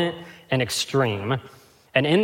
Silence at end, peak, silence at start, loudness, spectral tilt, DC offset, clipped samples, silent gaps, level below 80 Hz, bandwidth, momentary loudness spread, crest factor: 0 s; -4 dBFS; 0 s; -24 LUFS; -5 dB/octave; under 0.1%; under 0.1%; none; -62 dBFS; 16.5 kHz; 7 LU; 20 dB